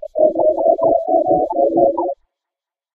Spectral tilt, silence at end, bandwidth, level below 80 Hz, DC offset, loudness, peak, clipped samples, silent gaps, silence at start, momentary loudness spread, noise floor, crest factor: -12 dB/octave; 0.8 s; 1.1 kHz; -52 dBFS; under 0.1%; -16 LUFS; 0 dBFS; under 0.1%; none; 0 s; 8 LU; -86 dBFS; 16 dB